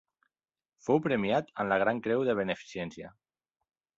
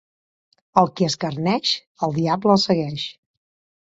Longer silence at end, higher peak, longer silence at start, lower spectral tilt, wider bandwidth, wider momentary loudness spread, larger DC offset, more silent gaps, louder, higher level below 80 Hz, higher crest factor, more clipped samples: first, 0.9 s vs 0.7 s; second, -12 dBFS vs 0 dBFS; about the same, 0.85 s vs 0.75 s; about the same, -6.5 dB/octave vs -5.5 dB/octave; about the same, 7.8 kHz vs 7.8 kHz; first, 13 LU vs 9 LU; neither; second, none vs 1.87-1.95 s; second, -30 LUFS vs -21 LUFS; second, -68 dBFS vs -60 dBFS; about the same, 20 dB vs 22 dB; neither